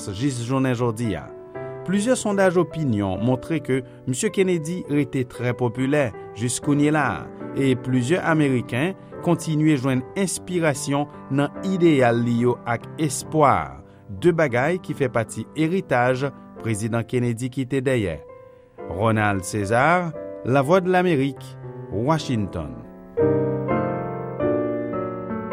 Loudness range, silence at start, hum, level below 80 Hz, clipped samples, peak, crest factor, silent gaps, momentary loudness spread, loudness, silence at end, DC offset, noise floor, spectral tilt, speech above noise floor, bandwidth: 3 LU; 0 s; none; -52 dBFS; under 0.1%; -4 dBFS; 20 dB; none; 11 LU; -22 LUFS; 0 s; under 0.1%; -45 dBFS; -6 dB/octave; 24 dB; 15.5 kHz